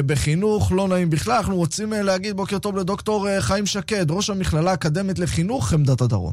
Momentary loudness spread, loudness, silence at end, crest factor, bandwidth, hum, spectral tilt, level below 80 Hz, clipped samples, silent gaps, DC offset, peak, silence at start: 4 LU; -21 LUFS; 0 s; 12 dB; 15.5 kHz; none; -5.5 dB/octave; -38 dBFS; under 0.1%; none; under 0.1%; -10 dBFS; 0 s